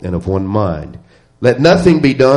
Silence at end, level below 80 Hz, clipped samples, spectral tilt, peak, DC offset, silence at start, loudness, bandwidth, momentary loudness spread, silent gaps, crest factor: 0 s; -36 dBFS; under 0.1%; -7 dB/octave; 0 dBFS; 0.1%; 0 s; -13 LUFS; 11.5 kHz; 12 LU; none; 12 dB